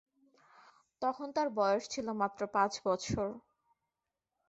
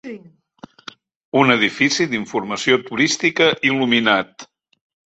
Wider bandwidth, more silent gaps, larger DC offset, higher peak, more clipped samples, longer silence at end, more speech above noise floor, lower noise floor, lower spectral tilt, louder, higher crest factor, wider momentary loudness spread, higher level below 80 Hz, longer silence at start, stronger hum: about the same, 8 kHz vs 8.2 kHz; second, none vs 1.16-1.32 s; neither; second, -16 dBFS vs 0 dBFS; neither; first, 1.1 s vs 0.7 s; first, 55 dB vs 26 dB; first, -89 dBFS vs -44 dBFS; about the same, -4 dB/octave vs -3.5 dB/octave; second, -34 LUFS vs -17 LUFS; about the same, 20 dB vs 18 dB; second, 6 LU vs 19 LU; about the same, -64 dBFS vs -62 dBFS; first, 1 s vs 0.05 s; neither